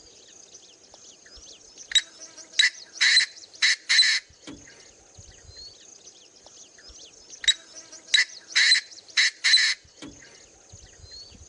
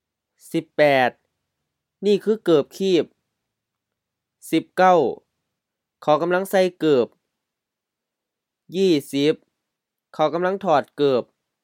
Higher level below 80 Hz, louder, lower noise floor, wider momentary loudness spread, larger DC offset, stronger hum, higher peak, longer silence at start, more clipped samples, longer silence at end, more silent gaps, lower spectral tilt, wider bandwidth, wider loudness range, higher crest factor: first, -62 dBFS vs -78 dBFS; about the same, -21 LUFS vs -20 LUFS; second, -51 dBFS vs -84 dBFS; first, 25 LU vs 12 LU; neither; neither; second, -6 dBFS vs -2 dBFS; first, 1.8 s vs 0.55 s; neither; second, 0.25 s vs 0.4 s; neither; second, 2.5 dB/octave vs -5.5 dB/octave; second, 10.5 kHz vs 17 kHz; first, 8 LU vs 3 LU; about the same, 22 dB vs 20 dB